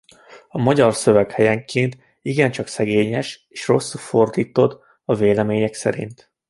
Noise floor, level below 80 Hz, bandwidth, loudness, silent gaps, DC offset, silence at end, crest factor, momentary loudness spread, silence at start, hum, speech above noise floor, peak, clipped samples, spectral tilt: -46 dBFS; -54 dBFS; 11.5 kHz; -19 LUFS; none; under 0.1%; 0.35 s; 18 dB; 13 LU; 0.3 s; none; 28 dB; -2 dBFS; under 0.1%; -6 dB/octave